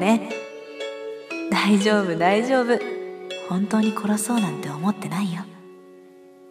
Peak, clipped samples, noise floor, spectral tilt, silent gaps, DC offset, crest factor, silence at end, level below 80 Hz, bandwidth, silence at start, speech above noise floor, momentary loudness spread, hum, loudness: -4 dBFS; under 0.1%; -47 dBFS; -5 dB/octave; none; under 0.1%; 20 dB; 0 s; -72 dBFS; 15.5 kHz; 0 s; 26 dB; 15 LU; none; -23 LUFS